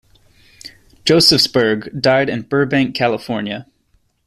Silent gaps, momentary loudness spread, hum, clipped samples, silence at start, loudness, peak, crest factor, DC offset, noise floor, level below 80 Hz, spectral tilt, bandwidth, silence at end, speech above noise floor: none; 13 LU; none; under 0.1%; 0.65 s; -15 LUFS; 0 dBFS; 18 dB; under 0.1%; -60 dBFS; -50 dBFS; -4.5 dB/octave; 14.5 kHz; 0.65 s; 45 dB